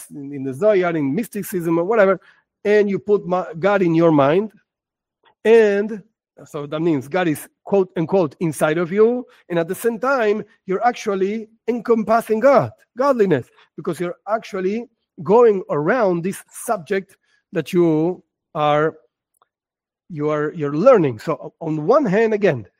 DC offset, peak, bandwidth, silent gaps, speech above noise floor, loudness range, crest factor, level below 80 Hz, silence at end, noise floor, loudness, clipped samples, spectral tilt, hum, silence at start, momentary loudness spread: under 0.1%; 0 dBFS; 16 kHz; none; over 72 dB; 4 LU; 18 dB; -66 dBFS; 0.15 s; under -90 dBFS; -19 LUFS; under 0.1%; -6.5 dB/octave; none; 0 s; 13 LU